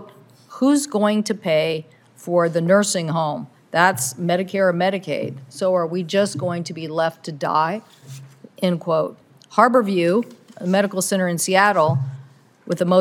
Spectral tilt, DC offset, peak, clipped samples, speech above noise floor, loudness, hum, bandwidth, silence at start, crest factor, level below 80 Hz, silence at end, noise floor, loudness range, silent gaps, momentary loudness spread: -5 dB/octave; under 0.1%; 0 dBFS; under 0.1%; 27 dB; -20 LUFS; none; 18 kHz; 0 s; 20 dB; -74 dBFS; 0 s; -46 dBFS; 4 LU; none; 13 LU